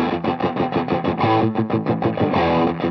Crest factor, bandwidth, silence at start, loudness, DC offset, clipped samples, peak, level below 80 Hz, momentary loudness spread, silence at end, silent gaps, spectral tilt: 14 dB; 6.2 kHz; 0 s; -20 LUFS; under 0.1%; under 0.1%; -4 dBFS; -50 dBFS; 4 LU; 0 s; none; -9 dB/octave